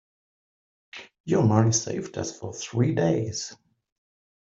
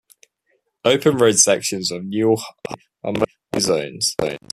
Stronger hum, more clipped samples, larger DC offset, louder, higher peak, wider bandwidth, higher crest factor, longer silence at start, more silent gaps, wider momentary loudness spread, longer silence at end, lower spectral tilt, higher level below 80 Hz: neither; neither; neither; second, -25 LUFS vs -19 LUFS; second, -4 dBFS vs 0 dBFS; second, 7.8 kHz vs 14.5 kHz; about the same, 22 dB vs 20 dB; about the same, 0.95 s vs 0.85 s; first, 1.20-1.24 s vs none; first, 20 LU vs 14 LU; first, 0.85 s vs 0.15 s; first, -5.5 dB/octave vs -3 dB/octave; second, -62 dBFS vs -56 dBFS